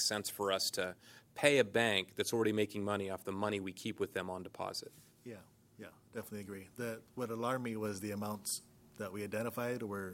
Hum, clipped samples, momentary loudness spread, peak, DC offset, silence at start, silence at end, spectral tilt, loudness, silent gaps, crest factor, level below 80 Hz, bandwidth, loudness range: none; under 0.1%; 21 LU; -12 dBFS; under 0.1%; 0 s; 0 s; -3.5 dB/octave; -37 LUFS; none; 26 dB; -78 dBFS; 16.5 kHz; 10 LU